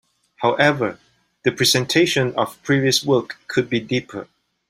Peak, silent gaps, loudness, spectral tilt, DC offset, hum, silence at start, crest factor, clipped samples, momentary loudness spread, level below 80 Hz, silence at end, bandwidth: -2 dBFS; none; -19 LUFS; -4 dB/octave; under 0.1%; none; 0.4 s; 20 dB; under 0.1%; 8 LU; -58 dBFS; 0.45 s; 16 kHz